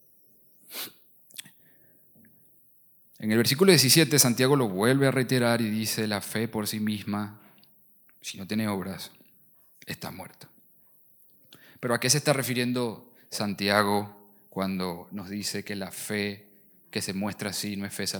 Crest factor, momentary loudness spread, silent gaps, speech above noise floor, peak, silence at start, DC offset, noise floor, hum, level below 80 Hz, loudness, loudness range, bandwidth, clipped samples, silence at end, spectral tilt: 24 dB; 20 LU; none; 33 dB; -4 dBFS; 0.7 s; under 0.1%; -59 dBFS; none; -74 dBFS; -26 LUFS; 14 LU; 19 kHz; under 0.1%; 0 s; -4 dB/octave